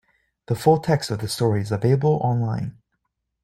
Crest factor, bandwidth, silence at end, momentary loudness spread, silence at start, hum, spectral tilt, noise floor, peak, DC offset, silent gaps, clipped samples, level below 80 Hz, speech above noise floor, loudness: 18 dB; 16 kHz; 0.75 s; 9 LU; 0.5 s; none; -6.5 dB/octave; -76 dBFS; -4 dBFS; under 0.1%; none; under 0.1%; -54 dBFS; 55 dB; -22 LUFS